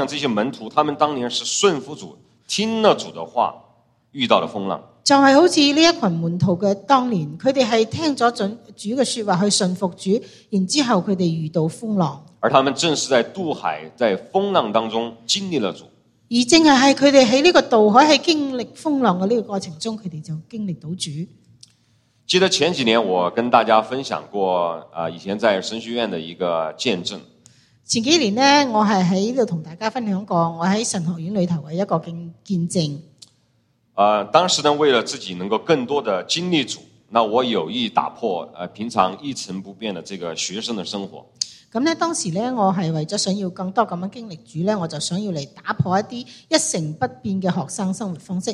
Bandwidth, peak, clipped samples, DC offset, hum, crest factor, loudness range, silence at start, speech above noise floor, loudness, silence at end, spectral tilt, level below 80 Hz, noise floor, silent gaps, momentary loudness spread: 12.5 kHz; 0 dBFS; under 0.1%; under 0.1%; none; 20 dB; 8 LU; 0 s; 44 dB; -19 LUFS; 0 s; -4 dB/octave; -62 dBFS; -63 dBFS; none; 14 LU